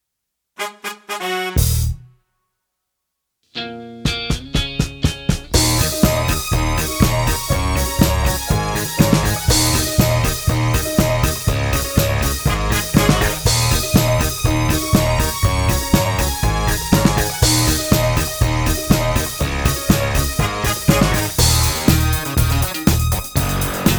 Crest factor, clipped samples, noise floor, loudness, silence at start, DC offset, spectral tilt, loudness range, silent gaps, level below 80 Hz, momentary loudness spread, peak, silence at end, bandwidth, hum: 18 dB; under 0.1%; -78 dBFS; -17 LUFS; 0.6 s; under 0.1%; -4.5 dB/octave; 7 LU; none; -24 dBFS; 7 LU; 0 dBFS; 0 s; over 20 kHz; none